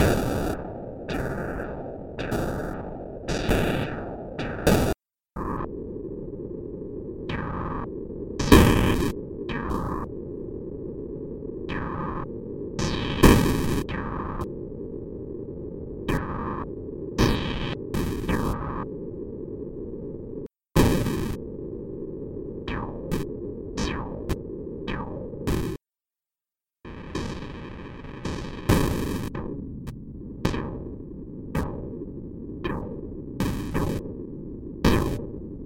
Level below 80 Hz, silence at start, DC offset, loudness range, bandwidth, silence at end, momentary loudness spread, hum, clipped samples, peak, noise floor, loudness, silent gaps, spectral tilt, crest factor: -36 dBFS; 0 s; under 0.1%; 9 LU; 17 kHz; 0 s; 14 LU; none; under 0.1%; -4 dBFS; under -90 dBFS; -28 LUFS; none; -6 dB/octave; 24 dB